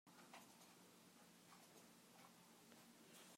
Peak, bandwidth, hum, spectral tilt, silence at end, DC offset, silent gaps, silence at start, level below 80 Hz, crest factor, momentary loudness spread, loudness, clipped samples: -46 dBFS; 16 kHz; none; -2.5 dB/octave; 0 s; under 0.1%; none; 0.05 s; under -90 dBFS; 20 dB; 4 LU; -66 LUFS; under 0.1%